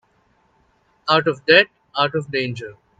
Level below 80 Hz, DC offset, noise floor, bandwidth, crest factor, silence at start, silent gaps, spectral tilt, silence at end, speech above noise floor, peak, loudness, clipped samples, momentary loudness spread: -64 dBFS; under 0.1%; -61 dBFS; 8.8 kHz; 22 dB; 1.05 s; none; -5.5 dB/octave; 0.25 s; 43 dB; 0 dBFS; -18 LUFS; under 0.1%; 14 LU